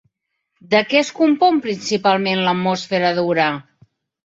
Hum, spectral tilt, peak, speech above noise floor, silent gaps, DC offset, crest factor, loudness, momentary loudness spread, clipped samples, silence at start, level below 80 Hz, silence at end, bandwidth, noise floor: none; -5 dB/octave; -2 dBFS; 57 dB; none; under 0.1%; 16 dB; -17 LUFS; 6 LU; under 0.1%; 0.7 s; -64 dBFS; 0.65 s; 7.8 kHz; -75 dBFS